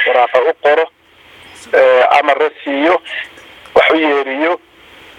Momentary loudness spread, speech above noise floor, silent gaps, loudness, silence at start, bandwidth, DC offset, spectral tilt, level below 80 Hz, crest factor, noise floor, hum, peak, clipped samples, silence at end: 12 LU; 30 dB; none; -12 LUFS; 0 s; 11 kHz; under 0.1%; -3.5 dB/octave; -56 dBFS; 14 dB; -42 dBFS; none; 0 dBFS; under 0.1%; 0.6 s